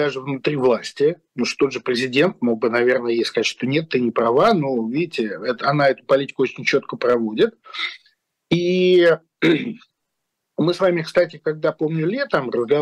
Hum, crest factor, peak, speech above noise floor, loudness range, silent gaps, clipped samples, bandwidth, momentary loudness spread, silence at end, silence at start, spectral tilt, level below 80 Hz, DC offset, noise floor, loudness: none; 12 dB; -8 dBFS; 58 dB; 2 LU; none; under 0.1%; 11.5 kHz; 8 LU; 0 s; 0 s; -6 dB/octave; -64 dBFS; under 0.1%; -78 dBFS; -20 LUFS